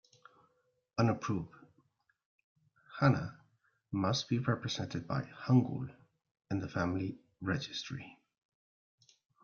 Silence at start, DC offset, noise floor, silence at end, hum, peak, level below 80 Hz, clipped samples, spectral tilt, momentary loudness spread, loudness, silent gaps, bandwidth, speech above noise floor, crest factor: 0.95 s; under 0.1%; -75 dBFS; 1.3 s; none; -14 dBFS; -68 dBFS; under 0.1%; -6 dB/octave; 15 LU; -35 LUFS; 2.25-2.38 s, 2.44-2.55 s, 6.31-6.35 s; 7.2 kHz; 41 dB; 22 dB